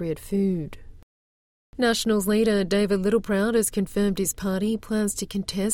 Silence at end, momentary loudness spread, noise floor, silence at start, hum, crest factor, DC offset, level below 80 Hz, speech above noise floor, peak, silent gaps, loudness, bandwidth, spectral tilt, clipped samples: 0 s; 7 LU; under -90 dBFS; 0 s; none; 14 dB; under 0.1%; -46 dBFS; over 66 dB; -10 dBFS; 1.03-1.73 s; -24 LUFS; 17 kHz; -4.5 dB/octave; under 0.1%